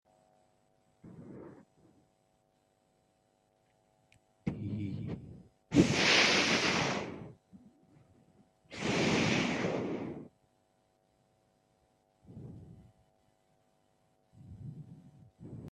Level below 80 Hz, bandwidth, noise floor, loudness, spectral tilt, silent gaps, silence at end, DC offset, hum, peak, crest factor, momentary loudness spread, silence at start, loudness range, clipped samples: -64 dBFS; 13 kHz; -73 dBFS; -30 LUFS; -4 dB/octave; none; 0 s; under 0.1%; none; -10 dBFS; 26 dB; 26 LU; 1.05 s; 23 LU; under 0.1%